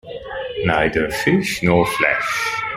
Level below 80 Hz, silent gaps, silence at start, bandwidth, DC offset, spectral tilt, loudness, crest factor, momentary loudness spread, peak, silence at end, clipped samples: -42 dBFS; none; 0.05 s; 16 kHz; under 0.1%; -5 dB/octave; -18 LUFS; 18 dB; 10 LU; -2 dBFS; 0 s; under 0.1%